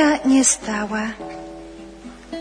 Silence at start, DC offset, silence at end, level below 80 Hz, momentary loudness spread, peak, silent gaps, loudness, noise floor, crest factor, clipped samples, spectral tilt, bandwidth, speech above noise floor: 0 s; under 0.1%; 0 s; -48 dBFS; 24 LU; -4 dBFS; none; -18 LUFS; -39 dBFS; 16 dB; under 0.1%; -2.5 dB/octave; 10.5 kHz; 19 dB